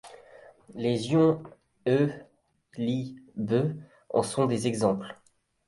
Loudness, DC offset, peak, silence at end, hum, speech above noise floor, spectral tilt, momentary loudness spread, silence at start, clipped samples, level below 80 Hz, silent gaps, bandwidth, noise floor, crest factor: -28 LUFS; under 0.1%; -10 dBFS; 0.55 s; none; 26 dB; -6.5 dB/octave; 18 LU; 0.05 s; under 0.1%; -64 dBFS; none; 11.5 kHz; -53 dBFS; 18 dB